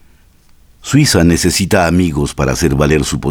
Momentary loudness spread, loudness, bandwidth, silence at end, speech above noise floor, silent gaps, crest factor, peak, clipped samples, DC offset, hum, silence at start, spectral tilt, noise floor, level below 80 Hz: 6 LU; -12 LUFS; 19 kHz; 0 s; 34 dB; none; 12 dB; 0 dBFS; under 0.1%; under 0.1%; none; 0.85 s; -5 dB/octave; -46 dBFS; -30 dBFS